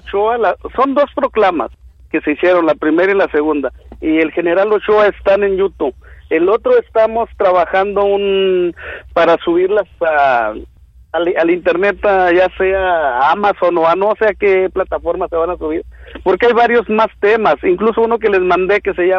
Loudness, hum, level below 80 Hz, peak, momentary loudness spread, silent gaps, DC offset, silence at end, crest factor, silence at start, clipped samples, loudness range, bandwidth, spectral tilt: -14 LUFS; none; -40 dBFS; -2 dBFS; 8 LU; none; under 0.1%; 0 s; 10 dB; 0.05 s; under 0.1%; 2 LU; 6.4 kHz; -7 dB/octave